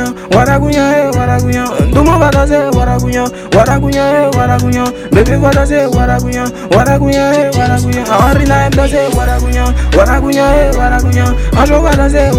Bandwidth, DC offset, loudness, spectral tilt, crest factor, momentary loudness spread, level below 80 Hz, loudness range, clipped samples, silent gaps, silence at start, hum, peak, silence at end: 16 kHz; under 0.1%; -10 LUFS; -6 dB/octave; 8 dB; 4 LU; -16 dBFS; 0 LU; 0.6%; none; 0 s; none; 0 dBFS; 0 s